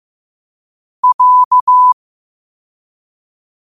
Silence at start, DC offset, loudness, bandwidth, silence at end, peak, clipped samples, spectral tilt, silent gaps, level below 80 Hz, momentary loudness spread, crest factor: 1.05 s; 0.3%; -10 LUFS; 1.3 kHz; 1.75 s; -4 dBFS; under 0.1%; -1 dB/octave; 1.14-1.19 s, 1.45-1.51 s, 1.61-1.67 s; -70 dBFS; 7 LU; 12 dB